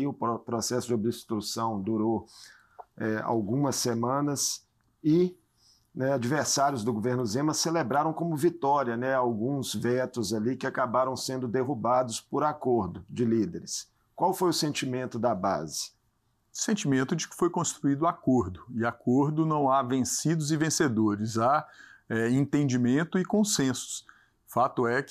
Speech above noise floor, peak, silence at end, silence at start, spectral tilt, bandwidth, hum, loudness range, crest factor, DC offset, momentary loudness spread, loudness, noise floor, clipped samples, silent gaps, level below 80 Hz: 44 dB; -14 dBFS; 0 s; 0 s; -5 dB/octave; 15.5 kHz; none; 3 LU; 14 dB; under 0.1%; 7 LU; -28 LUFS; -72 dBFS; under 0.1%; none; -66 dBFS